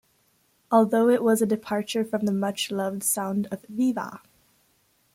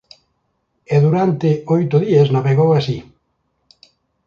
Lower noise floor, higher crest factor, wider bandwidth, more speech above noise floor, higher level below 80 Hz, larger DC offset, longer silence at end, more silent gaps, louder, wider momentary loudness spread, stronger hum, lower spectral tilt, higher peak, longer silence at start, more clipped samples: about the same, -66 dBFS vs -68 dBFS; about the same, 18 dB vs 16 dB; first, 16.5 kHz vs 7 kHz; second, 42 dB vs 54 dB; second, -70 dBFS vs -54 dBFS; neither; second, 0.95 s vs 1.25 s; neither; second, -24 LUFS vs -15 LUFS; first, 9 LU vs 5 LU; neither; second, -4.5 dB/octave vs -9 dB/octave; second, -8 dBFS vs -2 dBFS; second, 0.7 s vs 0.9 s; neither